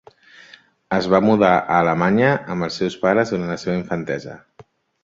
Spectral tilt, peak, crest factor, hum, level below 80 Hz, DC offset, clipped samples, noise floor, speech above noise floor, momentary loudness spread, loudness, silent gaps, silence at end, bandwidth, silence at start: -6.5 dB/octave; -2 dBFS; 18 dB; none; -52 dBFS; under 0.1%; under 0.1%; -50 dBFS; 32 dB; 10 LU; -19 LUFS; none; 0.65 s; 7.8 kHz; 0.9 s